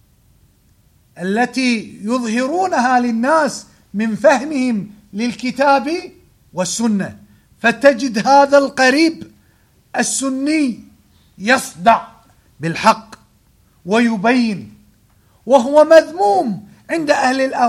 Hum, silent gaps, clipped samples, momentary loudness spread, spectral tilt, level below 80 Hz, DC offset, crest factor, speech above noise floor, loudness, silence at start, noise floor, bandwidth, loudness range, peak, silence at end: none; none; under 0.1%; 14 LU; -4 dB/octave; -58 dBFS; under 0.1%; 16 dB; 39 dB; -15 LUFS; 1.15 s; -54 dBFS; 14.5 kHz; 4 LU; 0 dBFS; 0 s